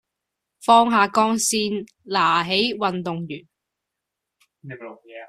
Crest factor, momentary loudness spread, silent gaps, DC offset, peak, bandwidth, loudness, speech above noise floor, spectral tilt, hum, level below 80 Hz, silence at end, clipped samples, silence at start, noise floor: 20 dB; 22 LU; none; under 0.1%; -2 dBFS; 14 kHz; -20 LUFS; 62 dB; -3 dB/octave; none; -66 dBFS; 0 s; under 0.1%; 0.65 s; -83 dBFS